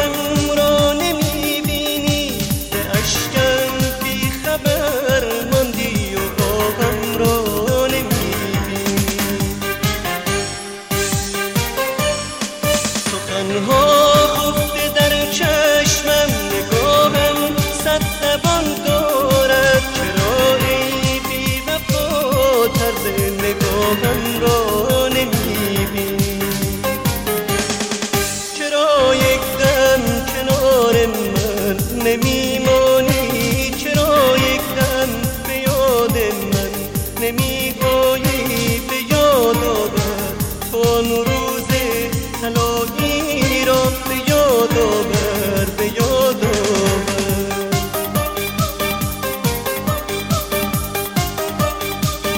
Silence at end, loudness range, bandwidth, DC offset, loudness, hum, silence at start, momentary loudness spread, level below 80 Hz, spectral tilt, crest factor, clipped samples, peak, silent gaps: 0 s; 4 LU; 17 kHz; under 0.1%; -17 LUFS; none; 0 s; 7 LU; -32 dBFS; -4 dB/octave; 16 dB; under 0.1%; 0 dBFS; none